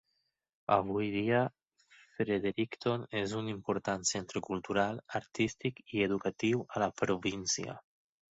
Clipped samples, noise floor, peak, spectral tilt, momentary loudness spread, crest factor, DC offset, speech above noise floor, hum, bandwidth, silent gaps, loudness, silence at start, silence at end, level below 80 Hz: under 0.1%; -81 dBFS; -12 dBFS; -4.5 dB/octave; 7 LU; 22 dB; under 0.1%; 48 dB; none; 8.2 kHz; none; -34 LUFS; 0.7 s; 0.6 s; -66 dBFS